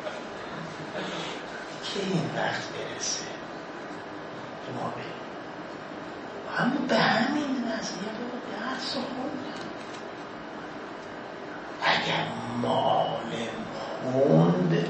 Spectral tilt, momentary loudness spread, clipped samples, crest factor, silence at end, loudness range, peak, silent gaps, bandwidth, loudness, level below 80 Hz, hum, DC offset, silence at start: -5 dB/octave; 15 LU; under 0.1%; 22 dB; 0 s; 7 LU; -8 dBFS; none; 8.8 kHz; -30 LUFS; -66 dBFS; none; under 0.1%; 0 s